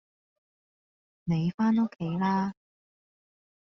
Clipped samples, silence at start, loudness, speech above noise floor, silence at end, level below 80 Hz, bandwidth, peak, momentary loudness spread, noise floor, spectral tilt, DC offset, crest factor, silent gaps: under 0.1%; 1.25 s; -28 LUFS; over 63 dB; 1.15 s; -66 dBFS; 6.4 kHz; -16 dBFS; 8 LU; under -90 dBFS; -7.5 dB/octave; under 0.1%; 16 dB; 1.54-1.58 s